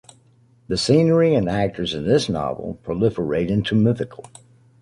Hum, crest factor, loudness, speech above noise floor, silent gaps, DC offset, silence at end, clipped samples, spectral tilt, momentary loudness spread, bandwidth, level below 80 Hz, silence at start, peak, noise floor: none; 16 dB; -20 LUFS; 36 dB; none; under 0.1%; 0.6 s; under 0.1%; -6.5 dB/octave; 11 LU; 11.5 kHz; -46 dBFS; 0.7 s; -4 dBFS; -55 dBFS